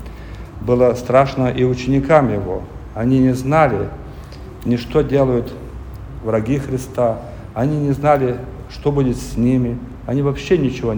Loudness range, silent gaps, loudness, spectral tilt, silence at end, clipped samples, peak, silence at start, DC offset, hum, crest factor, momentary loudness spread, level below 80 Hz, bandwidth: 4 LU; none; -18 LUFS; -7.5 dB/octave; 0 s; under 0.1%; 0 dBFS; 0 s; under 0.1%; none; 18 dB; 18 LU; -34 dBFS; over 20 kHz